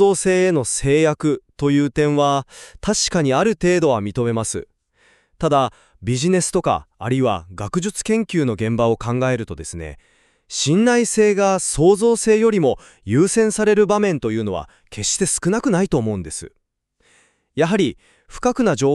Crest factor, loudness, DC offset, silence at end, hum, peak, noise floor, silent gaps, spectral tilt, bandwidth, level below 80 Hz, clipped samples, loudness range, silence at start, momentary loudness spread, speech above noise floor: 16 dB; -18 LUFS; under 0.1%; 0 s; none; -4 dBFS; -64 dBFS; none; -5 dB/octave; 13 kHz; -44 dBFS; under 0.1%; 5 LU; 0 s; 11 LU; 47 dB